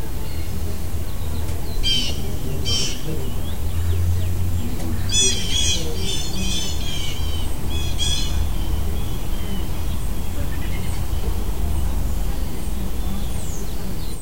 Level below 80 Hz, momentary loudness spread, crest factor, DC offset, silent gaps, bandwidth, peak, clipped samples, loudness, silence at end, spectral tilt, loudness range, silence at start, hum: -26 dBFS; 9 LU; 18 dB; 9%; none; 16 kHz; -4 dBFS; under 0.1%; -24 LUFS; 0 s; -3.5 dB/octave; 5 LU; 0 s; none